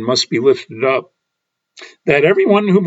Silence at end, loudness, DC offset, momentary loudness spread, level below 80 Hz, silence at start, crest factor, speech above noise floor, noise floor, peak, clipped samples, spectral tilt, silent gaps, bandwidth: 0 s; -14 LUFS; under 0.1%; 6 LU; -58 dBFS; 0 s; 16 dB; 62 dB; -76 dBFS; 0 dBFS; under 0.1%; -5 dB/octave; none; 8 kHz